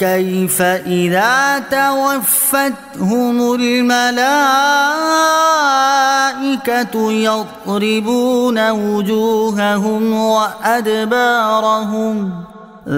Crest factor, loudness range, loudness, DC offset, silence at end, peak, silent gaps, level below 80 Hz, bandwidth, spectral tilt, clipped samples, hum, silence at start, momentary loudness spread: 12 dB; 3 LU; -14 LUFS; under 0.1%; 0 s; -2 dBFS; none; -58 dBFS; 16.5 kHz; -3.5 dB/octave; under 0.1%; none; 0 s; 6 LU